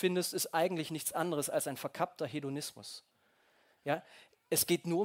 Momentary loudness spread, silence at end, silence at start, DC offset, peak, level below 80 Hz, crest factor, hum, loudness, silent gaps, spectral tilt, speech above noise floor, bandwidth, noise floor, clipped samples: 12 LU; 0 s; 0 s; under 0.1%; -16 dBFS; -78 dBFS; 20 dB; none; -35 LUFS; none; -3.5 dB/octave; 36 dB; 16.5 kHz; -71 dBFS; under 0.1%